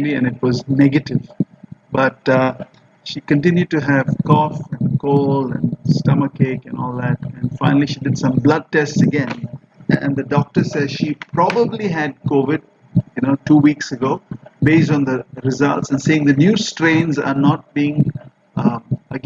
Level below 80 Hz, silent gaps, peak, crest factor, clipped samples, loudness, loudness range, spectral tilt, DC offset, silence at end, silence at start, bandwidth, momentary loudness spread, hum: -52 dBFS; none; -2 dBFS; 16 dB; under 0.1%; -17 LUFS; 2 LU; -7 dB/octave; under 0.1%; 0.05 s; 0 s; 7.6 kHz; 11 LU; none